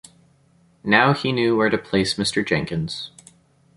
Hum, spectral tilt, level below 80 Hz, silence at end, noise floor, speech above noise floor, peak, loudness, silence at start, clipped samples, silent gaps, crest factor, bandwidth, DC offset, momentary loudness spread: none; -5 dB/octave; -52 dBFS; 0.7 s; -58 dBFS; 38 dB; -2 dBFS; -20 LUFS; 0.85 s; under 0.1%; none; 20 dB; 11.5 kHz; under 0.1%; 14 LU